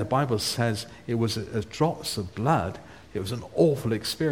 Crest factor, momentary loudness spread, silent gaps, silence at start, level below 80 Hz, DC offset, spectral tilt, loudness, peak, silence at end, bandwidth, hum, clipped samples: 18 dB; 10 LU; none; 0 s; -52 dBFS; 0.1%; -5.5 dB/octave; -27 LUFS; -8 dBFS; 0 s; 17.5 kHz; none; under 0.1%